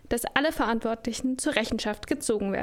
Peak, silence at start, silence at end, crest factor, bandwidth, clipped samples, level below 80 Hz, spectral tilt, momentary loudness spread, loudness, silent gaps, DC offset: -6 dBFS; 0.05 s; 0 s; 22 dB; 17 kHz; under 0.1%; -48 dBFS; -3.5 dB/octave; 5 LU; -27 LUFS; none; under 0.1%